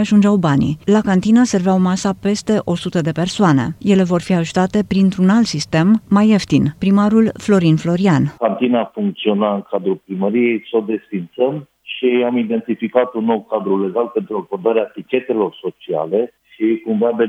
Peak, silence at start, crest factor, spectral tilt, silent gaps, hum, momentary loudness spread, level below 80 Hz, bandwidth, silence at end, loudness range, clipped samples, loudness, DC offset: 0 dBFS; 0 s; 16 dB; -6.5 dB/octave; none; none; 8 LU; -50 dBFS; 10.5 kHz; 0 s; 5 LU; under 0.1%; -16 LUFS; under 0.1%